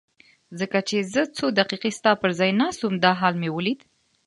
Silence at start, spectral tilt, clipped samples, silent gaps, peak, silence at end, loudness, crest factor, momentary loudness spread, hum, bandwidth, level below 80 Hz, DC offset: 0.5 s; -5 dB/octave; under 0.1%; none; -2 dBFS; 0.5 s; -23 LUFS; 22 dB; 7 LU; none; 11.5 kHz; -66 dBFS; under 0.1%